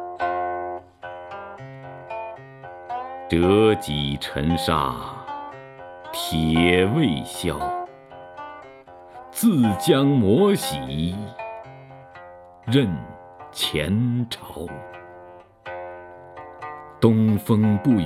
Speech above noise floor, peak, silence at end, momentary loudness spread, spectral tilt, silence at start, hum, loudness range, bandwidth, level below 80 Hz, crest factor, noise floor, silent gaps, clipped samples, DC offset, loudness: 25 dB; -2 dBFS; 0 s; 23 LU; -6 dB/octave; 0 s; none; 7 LU; 16 kHz; -46 dBFS; 20 dB; -45 dBFS; none; under 0.1%; under 0.1%; -22 LUFS